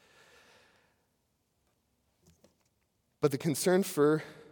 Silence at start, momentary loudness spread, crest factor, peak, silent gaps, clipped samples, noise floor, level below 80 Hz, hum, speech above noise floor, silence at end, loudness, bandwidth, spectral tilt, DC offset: 3.2 s; 6 LU; 22 dB; -12 dBFS; none; under 0.1%; -77 dBFS; -78 dBFS; none; 48 dB; 0.2 s; -29 LUFS; 18 kHz; -5.5 dB/octave; under 0.1%